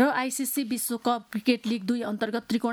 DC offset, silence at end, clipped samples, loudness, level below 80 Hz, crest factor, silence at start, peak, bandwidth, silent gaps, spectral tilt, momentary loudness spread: under 0.1%; 0 s; under 0.1%; -28 LUFS; -70 dBFS; 18 dB; 0 s; -10 dBFS; 19 kHz; none; -3.5 dB/octave; 3 LU